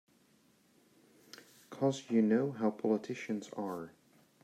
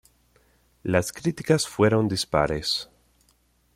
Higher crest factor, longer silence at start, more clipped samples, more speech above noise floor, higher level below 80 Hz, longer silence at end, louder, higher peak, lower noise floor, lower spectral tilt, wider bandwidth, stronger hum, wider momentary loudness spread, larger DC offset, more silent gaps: about the same, 18 dB vs 20 dB; first, 1.7 s vs 0.85 s; neither; second, 35 dB vs 41 dB; second, -84 dBFS vs -50 dBFS; second, 0.55 s vs 0.9 s; second, -34 LUFS vs -24 LUFS; second, -18 dBFS vs -6 dBFS; first, -69 dBFS vs -64 dBFS; first, -6.5 dB/octave vs -5 dB/octave; second, 14 kHz vs 16.5 kHz; second, none vs 60 Hz at -50 dBFS; first, 24 LU vs 8 LU; neither; neither